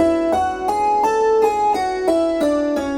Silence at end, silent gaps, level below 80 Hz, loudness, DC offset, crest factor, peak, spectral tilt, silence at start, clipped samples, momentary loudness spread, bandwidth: 0 s; none; -46 dBFS; -18 LUFS; under 0.1%; 12 dB; -4 dBFS; -5 dB/octave; 0 s; under 0.1%; 3 LU; 17 kHz